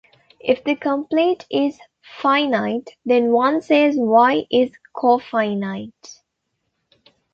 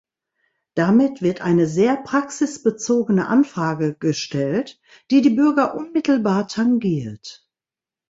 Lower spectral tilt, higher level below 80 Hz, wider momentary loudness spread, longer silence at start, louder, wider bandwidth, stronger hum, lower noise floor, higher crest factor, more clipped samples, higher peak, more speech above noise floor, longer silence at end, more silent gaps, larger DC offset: about the same, -6 dB/octave vs -6 dB/octave; second, -66 dBFS vs -60 dBFS; about the same, 10 LU vs 8 LU; second, 0.45 s vs 0.75 s; about the same, -19 LUFS vs -19 LUFS; about the same, 7.4 kHz vs 8 kHz; neither; second, -75 dBFS vs under -90 dBFS; about the same, 18 dB vs 14 dB; neither; first, -2 dBFS vs -6 dBFS; second, 57 dB vs over 71 dB; first, 1.2 s vs 0.75 s; neither; neither